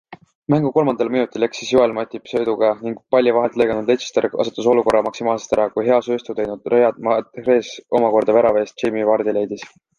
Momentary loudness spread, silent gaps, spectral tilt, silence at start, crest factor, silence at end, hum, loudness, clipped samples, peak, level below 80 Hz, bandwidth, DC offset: 7 LU; 0.35-0.42 s; -6 dB/octave; 0.1 s; 16 dB; 0.3 s; none; -18 LUFS; under 0.1%; -2 dBFS; -56 dBFS; 10.5 kHz; under 0.1%